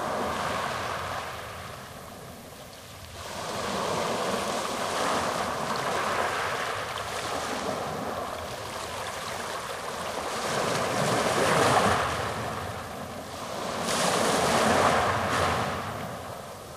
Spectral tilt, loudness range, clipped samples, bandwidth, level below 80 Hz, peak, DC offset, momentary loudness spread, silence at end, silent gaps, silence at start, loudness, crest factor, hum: -3.5 dB/octave; 7 LU; under 0.1%; 16 kHz; -54 dBFS; -10 dBFS; under 0.1%; 16 LU; 0 s; none; 0 s; -28 LUFS; 20 dB; none